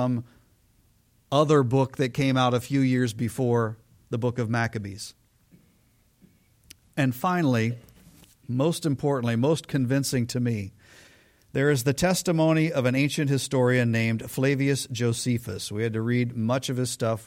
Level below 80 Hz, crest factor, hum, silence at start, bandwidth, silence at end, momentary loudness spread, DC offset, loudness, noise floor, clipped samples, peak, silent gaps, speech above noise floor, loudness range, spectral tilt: -58 dBFS; 18 dB; none; 0 s; 16.5 kHz; 0 s; 10 LU; under 0.1%; -25 LUFS; -63 dBFS; under 0.1%; -8 dBFS; none; 39 dB; 6 LU; -6 dB/octave